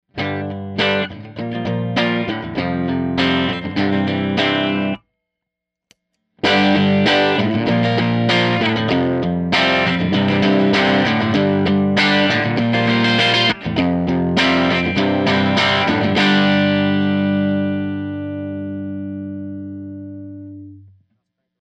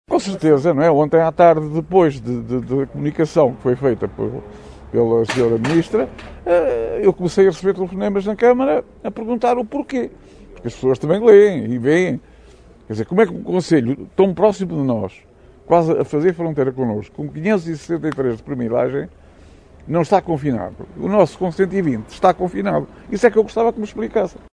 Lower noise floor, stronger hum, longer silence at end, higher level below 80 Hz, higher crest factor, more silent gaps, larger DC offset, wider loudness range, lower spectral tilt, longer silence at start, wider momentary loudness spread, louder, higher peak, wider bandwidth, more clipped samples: first, -82 dBFS vs -45 dBFS; neither; first, 0.8 s vs 0.25 s; about the same, -48 dBFS vs -46 dBFS; about the same, 16 dB vs 18 dB; neither; neither; about the same, 6 LU vs 4 LU; second, -6 dB/octave vs -7.5 dB/octave; about the same, 0.15 s vs 0.1 s; about the same, 13 LU vs 11 LU; about the same, -17 LUFS vs -18 LUFS; about the same, -2 dBFS vs 0 dBFS; second, 8.8 kHz vs 10.5 kHz; neither